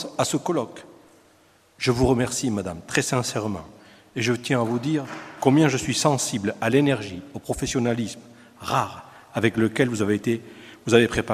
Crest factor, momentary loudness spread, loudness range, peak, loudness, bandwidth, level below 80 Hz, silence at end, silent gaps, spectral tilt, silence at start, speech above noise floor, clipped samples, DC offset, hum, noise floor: 22 dB; 16 LU; 3 LU; -2 dBFS; -23 LUFS; 15 kHz; -48 dBFS; 0 s; none; -5 dB/octave; 0 s; 35 dB; under 0.1%; under 0.1%; none; -58 dBFS